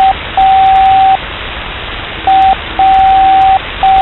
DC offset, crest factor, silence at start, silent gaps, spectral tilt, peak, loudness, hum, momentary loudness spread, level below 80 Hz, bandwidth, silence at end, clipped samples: under 0.1%; 8 dB; 0 s; none; -5.5 dB/octave; 0 dBFS; -8 LUFS; none; 13 LU; -28 dBFS; 4.2 kHz; 0 s; under 0.1%